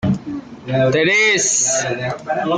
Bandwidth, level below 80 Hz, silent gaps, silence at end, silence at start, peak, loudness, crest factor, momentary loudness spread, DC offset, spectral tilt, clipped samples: 10 kHz; -52 dBFS; none; 0 s; 0 s; -4 dBFS; -16 LUFS; 12 dB; 11 LU; under 0.1%; -3 dB/octave; under 0.1%